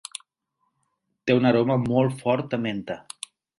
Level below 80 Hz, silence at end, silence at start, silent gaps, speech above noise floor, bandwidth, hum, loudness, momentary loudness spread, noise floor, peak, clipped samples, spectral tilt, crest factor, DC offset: -60 dBFS; 0.6 s; 1.25 s; none; 53 dB; 11.5 kHz; none; -23 LUFS; 18 LU; -75 dBFS; -6 dBFS; under 0.1%; -6.5 dB/octave; 20 dB; under 0.1%